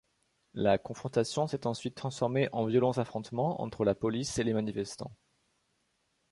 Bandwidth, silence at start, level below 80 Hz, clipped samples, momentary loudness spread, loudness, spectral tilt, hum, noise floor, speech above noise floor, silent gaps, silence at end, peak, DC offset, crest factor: 11.5 kHz; 0.55 s; -62 dBFS; under 0.1%; 9 LU; -32 LUFS; -6 dB/octave; none; -76 dBFS; 45 dB; none; 1.2 s; -14 dBFS; under 0.1%; 20 dB